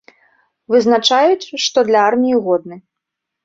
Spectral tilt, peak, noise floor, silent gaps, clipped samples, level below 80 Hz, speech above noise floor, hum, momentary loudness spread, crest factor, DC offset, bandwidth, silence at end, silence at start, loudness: -3 dB/octave; 0 dBFS; -80 dBFS; none; under 0.1%; -62 dBFS; 66 dB; none; 5 LU; 16 dB; under 0.1%; 7.8 kHz; 0.65 s; 0.7 s; -14 LUFS